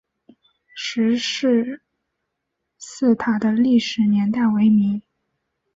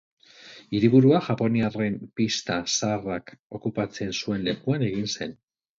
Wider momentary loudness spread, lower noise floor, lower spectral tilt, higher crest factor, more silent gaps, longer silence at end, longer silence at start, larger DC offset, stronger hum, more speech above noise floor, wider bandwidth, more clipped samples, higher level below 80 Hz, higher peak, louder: about the same, 15 LU vs 15 LU; first, -78 dBFS vs -49 dBFS; about the same, -5.5 dB/octave vs -5.5 dB/octave; second, 14 dB vs 20 dB; second, none vs 3.39-3.50 s; first, 0.75 s vs 0.45 s; first, 0.75 s vs 0.45 s; neither; neither; first, 60 dB vs 24 dB; about the same, 7.8 kHz vs 7.6 kHz; neither; about the same, -62 dBFS vs -58 dBFS; about the same, -6 dBFS vs -4 dBFS; first, -19 LUFS vs -25 LUFS